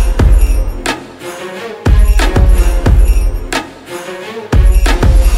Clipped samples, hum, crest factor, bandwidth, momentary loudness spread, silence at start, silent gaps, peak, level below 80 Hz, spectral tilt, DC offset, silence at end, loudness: under 0.1%; none; 10 dB; 12.5 kHz; 13 LU; 0 s; none; 0 dBFS; -10 dBFS; -5.5 dB/octave; under 0.1%; 0 s; -13 LUFS